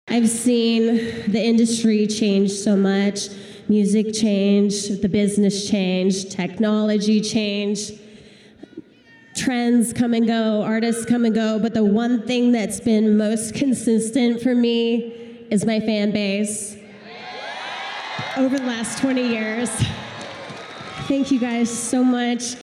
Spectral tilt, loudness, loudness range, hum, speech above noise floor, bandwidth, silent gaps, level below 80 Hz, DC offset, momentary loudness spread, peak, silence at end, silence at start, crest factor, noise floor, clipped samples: -5 dB/octave; -20 LUFS; 5 LU; none; 30 dB; 13 kHz; none; -56 dBFS; under 0.1%; 13 LU; -8 dBFS; 0.1 s; 0.05 s; 12 dB; -49 dBFS; under 0.1%